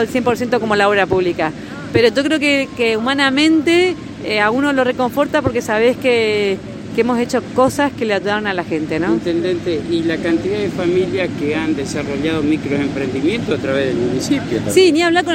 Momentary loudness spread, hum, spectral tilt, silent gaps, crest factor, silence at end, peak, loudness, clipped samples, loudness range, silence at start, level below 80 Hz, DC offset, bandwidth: 7 LU; none; -5 dB/octave; none; 16 dB; 0 s; 0 dBFS; -16 LUFS; under 0.1%; 3 LU; 0 s; -46 dBFS; under 0.1%; 16.5 kHz